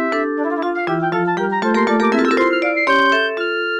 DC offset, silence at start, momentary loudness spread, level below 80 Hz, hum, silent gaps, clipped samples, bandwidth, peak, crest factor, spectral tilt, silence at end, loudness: under 0.1%; 0 s; 6 LU; -58 dBFS; none; none; under 0.1%; 10.5 kHz; -6 dBFS; 10 dB; -5.5 dB/octave; 0 s; -17 LUFS